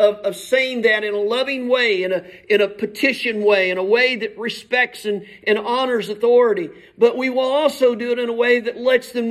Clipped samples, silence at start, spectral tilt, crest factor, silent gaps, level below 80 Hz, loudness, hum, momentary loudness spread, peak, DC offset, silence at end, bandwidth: under 0.1%; 0 s; -4 dB/octave; 16 dB; none; -66 dBFS; -18 LUFS; none; 8 LU; -2 dBFS; under 0.1%; 0 s; 14 kHz